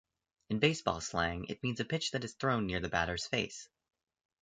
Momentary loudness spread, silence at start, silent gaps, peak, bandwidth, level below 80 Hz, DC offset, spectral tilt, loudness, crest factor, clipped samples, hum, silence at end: 7 LU; 0.5 s; none; -12 dBFS; 9.4 kHz; -56 dBFS; under 0.1%; -4.5 dB/octave; -34 LUFS; 24 dB; under 0.1%; none; 0.75 s